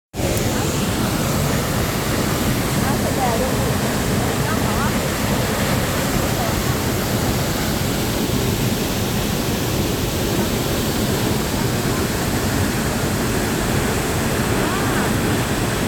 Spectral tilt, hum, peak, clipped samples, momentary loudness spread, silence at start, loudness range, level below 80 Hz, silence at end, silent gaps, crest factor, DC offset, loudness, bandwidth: -4.5 dB/octave; none; -6 dBFS; under 0.1%; 1 LU; 0.15 s; 1 LU; -32 dBFS; 0 s; none; 14 dB; under 0.1%; -20 LUFS; over 20 kHz